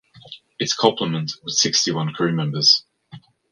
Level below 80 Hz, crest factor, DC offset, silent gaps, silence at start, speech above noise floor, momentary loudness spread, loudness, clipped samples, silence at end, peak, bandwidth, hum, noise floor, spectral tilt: -64 dBFS; 22 dB; under 0.1%; none; 0.15 s; 24 dB; 10 LU; -19 LUFS; under 0.1%; 0.35 s; 0 dBFS; 11 kHz; none; -45 dBFS; -3 dB/octave